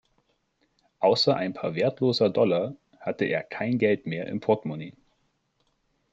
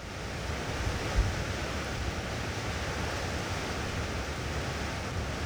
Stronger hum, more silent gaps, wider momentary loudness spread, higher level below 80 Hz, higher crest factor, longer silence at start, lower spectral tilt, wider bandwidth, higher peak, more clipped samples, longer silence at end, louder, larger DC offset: neither; neither; first, 13 LU vs 3 LU; second, -70 dBFS vs -38 dBFS; about the same, 20 dB vs 18 dB; first, 1 s vs 0 s; first, -6.5 dB/octave vs -4.5 dB/octave; second, 8 kHz vs over 20 kHz; first, -8 dBFS vs -16 dBFS; neither; first, 1.2 s vs 0 s; first, -26 LUFS vs -34 LUFS; neither